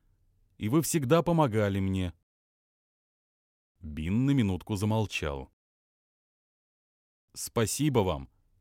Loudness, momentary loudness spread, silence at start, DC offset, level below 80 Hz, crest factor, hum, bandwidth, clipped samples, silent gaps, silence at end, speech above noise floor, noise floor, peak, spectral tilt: -29 LUFS; 13 LU; 0.6 s; under 0.1%; -52 dBFS; 20 dB; none; 16.5 kHz; under 0.1%; 2.23-3.75 s, 5.53-7.28 s; 0.35 s; 40 dB; -68 dBFS; -10 dBFS; -6 dB/octave